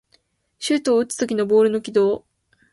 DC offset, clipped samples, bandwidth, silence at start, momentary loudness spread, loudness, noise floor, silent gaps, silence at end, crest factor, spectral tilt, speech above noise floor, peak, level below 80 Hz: under 0.1%; under 0.1%; 11.5 kHz; 0.6 s; 7 LU; -20 LUFS; -63 dBFS; none; 0.55 s; 14 dB; -4.5 dB/octave; 44 dB; -6 dBFS; -64 dBFS